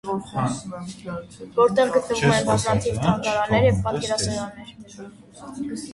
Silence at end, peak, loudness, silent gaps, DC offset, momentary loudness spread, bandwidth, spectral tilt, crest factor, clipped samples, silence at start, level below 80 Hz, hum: 0 s; -4 dBFS; -22 LUFS; none; under 0.1%; 22 LU; 11.5 kHz; -5 dB/octave; 18 dB; under 0.1%; 0.05 s; -46 dBFS; none